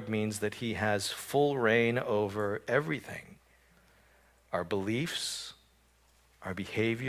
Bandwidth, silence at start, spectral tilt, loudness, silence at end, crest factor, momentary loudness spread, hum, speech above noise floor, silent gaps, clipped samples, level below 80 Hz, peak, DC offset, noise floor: 16 kHz; 0 s; -4.5 dB/octave; -32 LUFS; 0 s; 20 dB; 13 LU; none; 34 dB; none; under 0.1%; -62 dBFS; -12 dBFS; under 0.1%; -66 dBFS